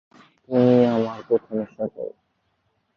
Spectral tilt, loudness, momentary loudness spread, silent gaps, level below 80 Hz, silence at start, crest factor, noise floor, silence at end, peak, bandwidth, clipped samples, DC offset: -9 dB/octave; -22 LUFS; 15 LU; none; -64 dBFS; 0.5 s; 18 dB; -70 dBFS; 0.85 s; -4 dBFS; 6.4 kHz; under 0.1%; under 0.1%